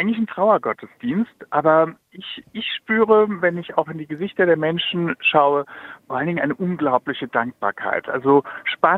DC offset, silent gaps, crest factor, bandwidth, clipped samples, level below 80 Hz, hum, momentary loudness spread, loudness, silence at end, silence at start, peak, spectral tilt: under 0.1%; none; 20 dB; 4.2 kHz; under 0.1%; -64 dBFS; none; 12 LU; -20 LUFS; 0 s; 0 s; -2 dBFS; -8 dB/octave